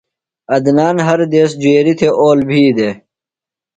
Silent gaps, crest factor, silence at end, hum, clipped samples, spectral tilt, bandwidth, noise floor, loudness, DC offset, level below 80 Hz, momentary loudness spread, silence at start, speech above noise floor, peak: none; 12 dB; 0.8 s; none; under 0.1%; -6.5 dB/octave; 9.2 kHz; -88 dBFS; -12 LUFS; under 0.1%; -54 dBFS; 7 LU; 0.5 s; 77 dB; 0 dBFS